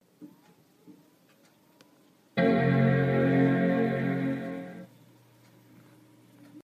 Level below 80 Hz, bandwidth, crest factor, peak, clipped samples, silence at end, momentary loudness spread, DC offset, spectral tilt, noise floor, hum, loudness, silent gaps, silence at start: -68 dBFS; 6 kHz; 16 dB; -12 dBFS; under 0.1%; 0.05 s; 15 LU; under 0.1%; -9 dB/octave; -62 dBFS; none; -26 LUFS; none; 0.2 s